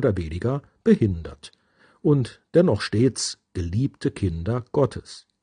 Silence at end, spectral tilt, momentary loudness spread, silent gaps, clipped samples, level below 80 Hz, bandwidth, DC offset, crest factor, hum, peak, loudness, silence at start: 0.25 s; -6.5 dB/octave; 12 LU; none; under 0.1%; -48 dBFS; 10 kHz; under 0.1%; 18 dB; none; -4 dBFS; -24 LUFS; 0 s